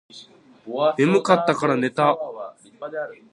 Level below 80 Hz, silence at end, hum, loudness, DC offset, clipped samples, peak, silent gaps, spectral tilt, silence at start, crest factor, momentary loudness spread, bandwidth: -72 dBFS; 0.2 s; none; -21 LUFS; under 0.1%; under 0.1%; 0 dBFS; none; -6 dB/octave; 0.15 s; 22 dB; 17 LU; 11 kHz